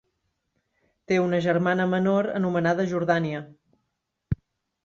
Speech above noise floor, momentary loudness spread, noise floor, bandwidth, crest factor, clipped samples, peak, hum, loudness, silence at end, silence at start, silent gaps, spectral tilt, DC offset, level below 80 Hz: 56 dB; 11 LU; -79 dBFS; 7.4 kHz; 18 dB; under 0.1%; -8 dBFS; none; -25 LUFS; 0.5 s; 1.1 s; none; -7.5 dB/octave; under 0.1%; -52 dBFS